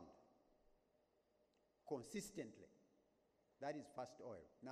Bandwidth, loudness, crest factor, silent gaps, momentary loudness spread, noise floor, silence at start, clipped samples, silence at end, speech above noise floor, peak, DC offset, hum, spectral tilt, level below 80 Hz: 13 kHz; -53 LUFS; 22 dB; none; 15 LU; -82 dBFS; 0 s; under 0.1%; 0 s; 29 dB; -34 dBFS; under 0.1%; none; -4.5 dB/octave; -84 dBFS